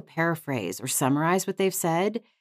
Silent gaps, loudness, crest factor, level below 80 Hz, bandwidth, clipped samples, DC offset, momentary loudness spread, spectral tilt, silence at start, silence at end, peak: none; -26 LUFS; 16 dB; -86 dBFS; 16 kHz; under 0.1%; under 0.1%; 7 LU; -4.5 dB/octave; 0.15 s; 0.2 s; -12 dBFS